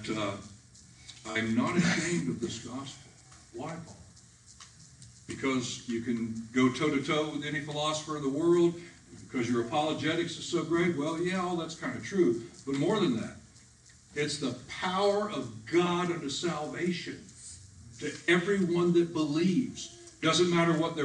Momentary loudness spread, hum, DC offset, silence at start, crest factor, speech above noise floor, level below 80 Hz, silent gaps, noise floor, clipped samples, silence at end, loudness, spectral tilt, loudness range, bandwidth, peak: 18 LU; none; under 0.1%; 0 s; 18 dB; 27 dB; -64 dBFS; none; -57 dBFS; under 0.1%; 0 s; -30 LUFS; -5 dB/octave; 6 LU; 10.5 kHz; -14 dBFS